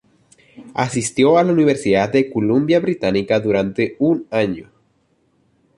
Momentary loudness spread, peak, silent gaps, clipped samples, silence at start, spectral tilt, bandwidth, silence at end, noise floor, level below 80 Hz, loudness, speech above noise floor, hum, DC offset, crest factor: 8 LU; -2 dBFS; none; under 0.1%; 0.6 s; -6 dB/octave; 11.5 kHz; 1.15 s; -62 dBFS; -52 dBFS; -17 LUFS; 45 dB; none; under 0.1%; 16 dB